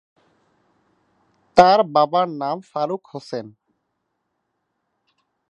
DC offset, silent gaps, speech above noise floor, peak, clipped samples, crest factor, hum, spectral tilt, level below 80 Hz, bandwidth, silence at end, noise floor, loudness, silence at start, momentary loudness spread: under 0.1%; none; 56 dB; 0 dBFS; under 0.1%; 22 dB; none; -5.5 dB/octave; -62 dBFS; 8.6 kHz; 2 s; -75 dBFS; -19 LUFS; 1.55 s; 18 LU